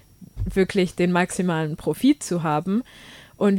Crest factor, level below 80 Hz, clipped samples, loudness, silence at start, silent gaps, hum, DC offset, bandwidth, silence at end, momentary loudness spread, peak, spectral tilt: 16 dB; -42 dBFS; under 0.1%; -23 LUFS; 0.2 s; none; none; under 0.1%; 16.5 kHz; 0 s; 7 LU; -6 dBFS; -6 dB/octave